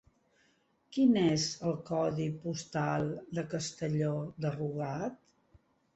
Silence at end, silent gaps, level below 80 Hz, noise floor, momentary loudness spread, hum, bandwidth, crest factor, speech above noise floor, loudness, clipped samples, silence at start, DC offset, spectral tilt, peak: 0.8 s; none; -66 dBFS; -72 dBFS; 10 LU; none; 8.2 kHz; 18 dB; 39 dB; -33 LUFS; under 0.1%; 0.9 s; under 0.1%; -6 dB/octave; -16 dBFS